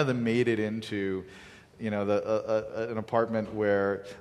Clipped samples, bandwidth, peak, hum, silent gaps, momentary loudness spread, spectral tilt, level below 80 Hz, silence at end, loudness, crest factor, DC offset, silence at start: under 0.1%; 12 kHz; -12 dBFS; none; none; 8 LU; -7 dB/octave; -60 dBFS; 0 s; -29 LUFS; 18 dB; under 0.1%; 0 s